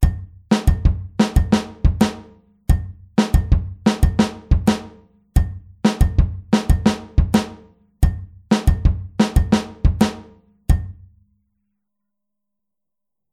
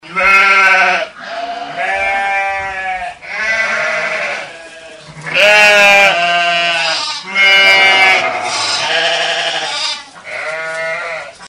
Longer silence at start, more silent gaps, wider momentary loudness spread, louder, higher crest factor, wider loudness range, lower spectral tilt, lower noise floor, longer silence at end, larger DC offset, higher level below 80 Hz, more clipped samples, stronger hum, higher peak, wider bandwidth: about the same, 0 s vs 0.05 s; neither; second, 5 LU vs 17 LU; second, -20 LUFS vs -10 LUFS; about the same, 18 dB vs 14 dB; second, 3 LU vs 8 LU; first, -6.5 dB/octave vs -0.5 dB/octave; first, -86 dBFS vs -34 dBFS; first, 2.4 s vs 0 s; neither; first, -22 dBFS vs -52 dBFS; second, under 0.1% vs 0.2%; neither; about the same, -2 dBFS vs 0 dBFS; second, 14.5 kHz vs 16.5 kHz